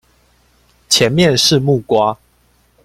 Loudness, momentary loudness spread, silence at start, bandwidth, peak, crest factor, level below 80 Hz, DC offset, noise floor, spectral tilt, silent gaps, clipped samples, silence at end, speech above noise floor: -13 LUFS; 7 LU; 0.9 s; 16.5 kHz; 0 dBFS; 16 dB; -48 dBFS; under 0.1%; -55 dBFS; -4 dB/octave; none; under 0.1%; 0.7 s; 43 dB